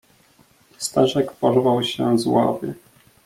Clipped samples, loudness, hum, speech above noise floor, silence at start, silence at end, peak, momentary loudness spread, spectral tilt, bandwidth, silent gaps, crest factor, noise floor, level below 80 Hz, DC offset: under 0.1%; -20 LUFS; none; 37 dB; 0.8 s; 0.5 s; -4 dBFS; 11 LU; -5.5 dB/octave; 16 kHz; none; 18 dB; -56 dBFS; -60 dBFS; under 0.1%